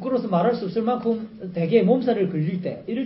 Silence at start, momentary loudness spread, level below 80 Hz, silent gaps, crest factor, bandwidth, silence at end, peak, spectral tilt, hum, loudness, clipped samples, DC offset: 0 s; 10 LU; -62 dBFS; none; 16 dB; 5.8 kHz; 0 s; -6 dBFS; -12.5 dB/octave; none; -23 LUFS; under 0.1%; under 0.1%